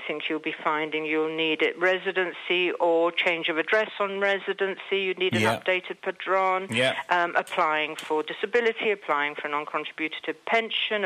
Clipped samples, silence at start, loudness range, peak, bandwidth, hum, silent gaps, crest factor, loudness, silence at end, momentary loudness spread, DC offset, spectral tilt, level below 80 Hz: under 0.1%; 0 s; 2 LU; -6 dBFS; 15 kHz; none; none; 20 dB; -25 LUFS; 0 s; 6 LU; under 0.1%; -4 dB/octave; -74 dBFS